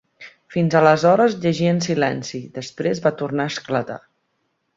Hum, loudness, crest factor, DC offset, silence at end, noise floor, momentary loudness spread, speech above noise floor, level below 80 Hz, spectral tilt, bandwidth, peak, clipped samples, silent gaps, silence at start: none; -19 LUFS; 18 dB; under 0.1%; 0.8 s; -71 dBFS; 16 LU; 52 dB; -60 dBFS; -6 dB/octave; 7.8 kHz; -2 dBFS; under 0.1%; none; 0.2 s